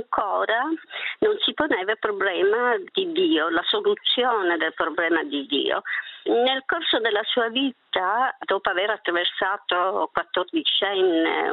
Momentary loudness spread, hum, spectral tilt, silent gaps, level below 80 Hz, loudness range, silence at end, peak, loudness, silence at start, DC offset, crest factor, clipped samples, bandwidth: 5 LU; none; -6.5 dB/octave; none; -66 dBFS; 1 LU; 0 s; -2 dBFS; -23 LUFS; 0 s; under 0.1%; 20 dB; under 0.1%; 4.7 kHz